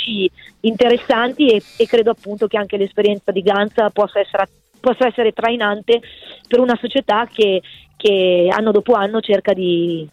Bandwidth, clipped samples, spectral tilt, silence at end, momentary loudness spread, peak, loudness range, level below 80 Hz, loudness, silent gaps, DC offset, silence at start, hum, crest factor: 9.6 kHz; under 0.1%; -6 dB/octave; 0.05 s; 7 LU; -4 dBFS; 2 LU; -56 dBFS; -16 LUFS; none; under 0.1%; 0 s; none; 14 dB